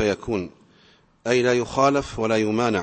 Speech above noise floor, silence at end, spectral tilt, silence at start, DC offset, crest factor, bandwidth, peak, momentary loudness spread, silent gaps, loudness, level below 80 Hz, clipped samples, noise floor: 35 dB; 0 s; -5 dB/octave; 0 s; under 0.1%; 18 dB; 8.8 kHz; -4 dBFS; 9 LU; none; -22 LUFS; -50 dBFS; under 0.1%; -56 dBFS